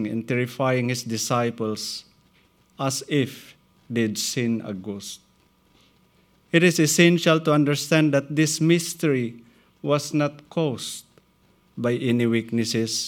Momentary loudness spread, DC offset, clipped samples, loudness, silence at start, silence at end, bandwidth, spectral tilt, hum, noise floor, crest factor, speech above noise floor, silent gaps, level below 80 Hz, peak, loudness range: 14 LU; under 0.1%; under 0.1%; -23 LUFS; 0 s; 0 s; 18.5 kHz; -4.5 dB/octave; none; -61 dBFS; 20 dB; 39 dB; none; -68 dBFS; -4 dBFS; 8 LU